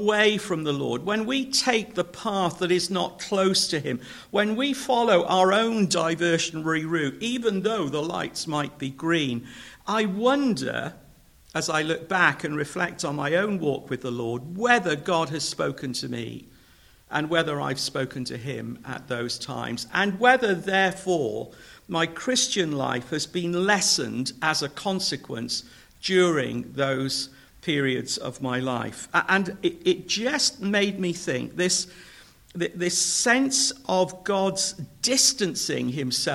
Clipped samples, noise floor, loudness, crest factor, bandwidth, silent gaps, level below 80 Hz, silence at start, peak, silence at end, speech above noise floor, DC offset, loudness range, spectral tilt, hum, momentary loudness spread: under 0.1%; -55 dBFS; -25 LUFS; 22 dB; 16.5 kHz; none; -60 dBFS; 0 s; -4 dBFS; 0 s; 30 dB; under 0.1%; 4 LU; -3 dB/octave; none; 11 LU